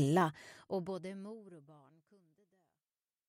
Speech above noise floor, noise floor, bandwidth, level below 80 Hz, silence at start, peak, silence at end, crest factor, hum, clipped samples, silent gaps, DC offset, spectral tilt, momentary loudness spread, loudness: over 53 dB; under -90 dBFS; 15 kHz; -82 dBFS; 0 s; -20 dBFS; 1.55 s; 20 dB; none; under 0.1%; none; under 0.1%; -6.5 dB/octave; 23 LU; -38 LUFS